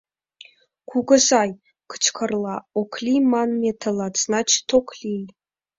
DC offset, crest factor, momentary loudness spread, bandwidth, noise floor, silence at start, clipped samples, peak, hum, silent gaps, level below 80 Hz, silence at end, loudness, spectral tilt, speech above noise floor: under 0.1%; 20 dB; 13 LU; 7.8 kHz; -50 dBFS; 0.9 s; under 0.1%; -4 dBFS; none; none; -62 dBFS; 0.5 s; -21 LUFS; -2.5 dB/octave; 29 dB